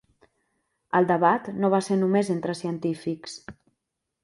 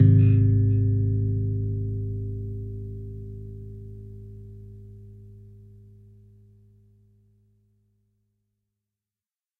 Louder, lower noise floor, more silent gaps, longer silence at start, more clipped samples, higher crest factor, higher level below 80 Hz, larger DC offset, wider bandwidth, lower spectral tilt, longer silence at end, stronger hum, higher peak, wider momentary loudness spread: about the same, -24 LUFS vs -24 LUFS; second, -81 dBFS vs under -90 dBFS; neither; first, 0.95 s vs 0 s; neither; about the same, 20 dB vs 20 dB; second, -68 dBFS vs -42 dBFS; neither; first, 11.5 kHz vs 2.8 kHz; second, -6.5 dB/octave vs -13 dB/octave; second, 0.7 s vs 4.2 s; neither; about the same, -6 dBFS vs -6 dBFS; second, 13 LU vs 26 LU